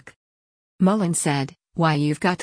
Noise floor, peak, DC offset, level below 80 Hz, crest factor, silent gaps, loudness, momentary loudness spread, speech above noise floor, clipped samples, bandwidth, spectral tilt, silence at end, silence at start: under -90 dBFS; -8 dBFS; under 0.1%; -60 dBFS; 16 dB; 0.16-0.79 s; -22 LUFS; 5 LU; over 69 dB; under 0.1%; 10.5 kHz; -5.5 dB/octave; 0 s; 0.05 s